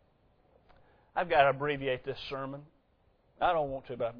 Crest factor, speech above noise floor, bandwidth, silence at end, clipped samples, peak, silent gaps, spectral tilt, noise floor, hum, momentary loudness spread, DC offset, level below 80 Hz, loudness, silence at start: 24 dB; 38 dB; 5.4 kHz; 0 s; under 0.1%; -10 dBFS; none; -7.5 dB/octave; -69 dBFS; none; 13 LU; under 0.1%; -60 dBFS; -31 LUFS; 1.15 s